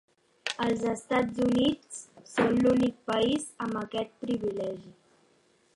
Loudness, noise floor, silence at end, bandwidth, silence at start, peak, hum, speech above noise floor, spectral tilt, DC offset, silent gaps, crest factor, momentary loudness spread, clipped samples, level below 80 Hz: -29 LUFS; -66 dBFS; 0.85 s; 11.5 kHz; 0.45 s; -12 dBFS; none; 38 dB; -5 dB/octave; under 0.1%; none; 18 dB; 13 LU; under 0.1%; -60 dBFS